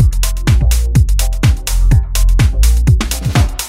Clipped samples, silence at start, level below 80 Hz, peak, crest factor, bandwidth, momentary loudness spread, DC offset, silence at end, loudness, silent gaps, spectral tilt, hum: under 0.1%; 0 s; -12 dBFS; 0 dBFS; 10 dB; 16.5 kHz; 3 LU; under 0.1%; 0 s; -13 LUFS; none; -5 dB/octave; none